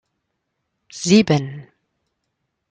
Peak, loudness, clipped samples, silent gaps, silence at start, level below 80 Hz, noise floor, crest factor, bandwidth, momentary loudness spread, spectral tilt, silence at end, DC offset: -2 dBFS; -17 LUFS; under 0.1%; none; 0.95 s; -60 dBFS; -75 dBFS; 20 dB; 9.4 kHz; 24 LU; -5.5 dB/octave; 1.1 s; under 0.1%